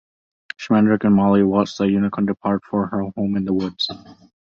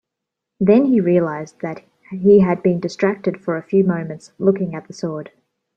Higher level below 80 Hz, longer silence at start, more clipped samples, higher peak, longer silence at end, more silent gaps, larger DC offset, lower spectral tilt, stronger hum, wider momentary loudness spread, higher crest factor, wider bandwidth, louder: first, -52 dBFS vs -58 dBFS; about the same, 0.6 s vs 0.6 s; neither; about the same, -4 dBFS vs -2 dBFS; second, 0.35 s vs 0.5 s; neither; neither; about the same, -7.5 dB/octave vs -8.5 dB/octave; neither; second, 9 LU vs 16 LU; about the same, 16 dB vs 16 dB; about the same, 7 kHz vs 7.6 kHz; about the same, -19 LUFS vs -18 LUFS